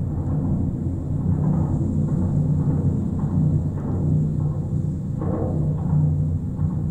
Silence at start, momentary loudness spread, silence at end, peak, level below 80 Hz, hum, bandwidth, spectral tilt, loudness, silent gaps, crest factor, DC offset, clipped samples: 0 s; 4 LU; 0 s; -10 dBFS; -36 dBFS; none; 7.6 kHz; -11.5 dB/octave; -23 LUFS; none; 12 dB; under 0.1%; under 0.1%